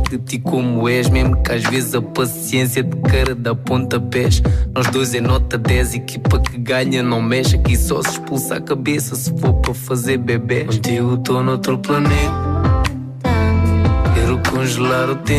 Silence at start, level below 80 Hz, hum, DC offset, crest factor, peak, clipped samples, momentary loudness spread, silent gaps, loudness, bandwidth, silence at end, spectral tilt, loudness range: 0 s; -24 dBFS; none; under 0.1%; 12 dB; -4 dBFS; under 0.1%; 5 LU; none; -17 LUFS; 15.5 kHz; 0 s; -5.5 dB/octave; 1 LU